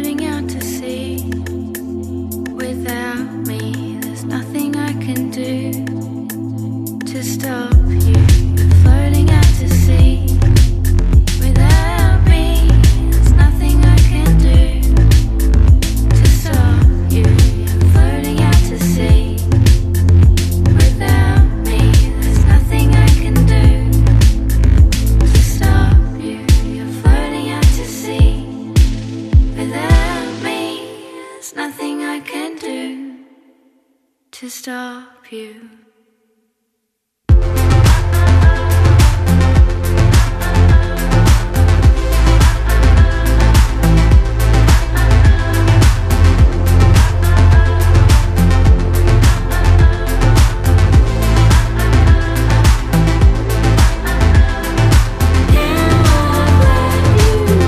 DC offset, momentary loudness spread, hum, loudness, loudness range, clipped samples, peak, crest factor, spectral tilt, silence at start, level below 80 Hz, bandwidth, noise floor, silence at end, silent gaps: under 0.1%; 12 LU; none; -13 LUFS; 11 LU; under 0.1%; 0 dBFS; 10 dB; -6 dB/octave; 0 s; -14 dBFS; 14 kHz; -71 dBFS; 0 s; none